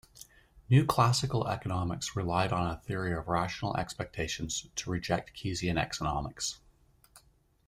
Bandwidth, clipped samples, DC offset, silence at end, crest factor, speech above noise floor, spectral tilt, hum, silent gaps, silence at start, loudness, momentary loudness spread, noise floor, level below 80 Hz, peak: 15.5 kHz; under 0.1%; under 0.1%; 0.5 s; 20 dB; 34 dB; -5 dB/octave; none; none; 0.15 s; -32 LUFS; 10 LU; -65 dBFS; -52 dBFS; -12 dBFS